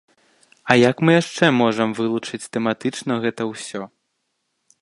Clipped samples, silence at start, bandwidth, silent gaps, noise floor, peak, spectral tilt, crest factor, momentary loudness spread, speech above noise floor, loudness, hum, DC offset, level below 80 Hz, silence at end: under 0.1%; 0.65 s; 11.5 kHz; none; -73 dBFS; 0 dBFS; -5.5 dB/octave; 20 dB; 15 LU; 54 dB; -19 LUFS; none; under 0.1%; -64 dBFS; 0.95 s